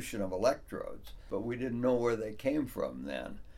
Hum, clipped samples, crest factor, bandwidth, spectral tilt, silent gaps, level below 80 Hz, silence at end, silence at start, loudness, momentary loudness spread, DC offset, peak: none; under 0.1%; 18 dB; 16.5 kHz; -6 dB/octave; none; -54 dBFS; 0 s; 0 s; -35 LUFS; 12 LU; under 0.1%; -16 dBFS